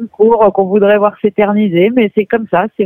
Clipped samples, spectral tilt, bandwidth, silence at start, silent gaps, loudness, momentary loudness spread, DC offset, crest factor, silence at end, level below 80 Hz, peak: under 0.1%; -10.5 dB/octave; 3.7 kHz; 0 s; none; -11 LUFS; 5 LU; under 0.1%; 10 dB; 0 s; -50 dBFS; 0 dBFS